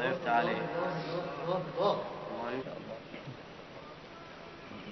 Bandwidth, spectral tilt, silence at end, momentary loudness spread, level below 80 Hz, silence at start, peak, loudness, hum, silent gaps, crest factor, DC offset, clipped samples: 6.2 kHz; -4 dB/octave; 0 s; 18 LU; -68 dBFS; 0 s; -18 dBFS; -35 LUFS; none; none; 18 dB; under 0.1%; under 0.1%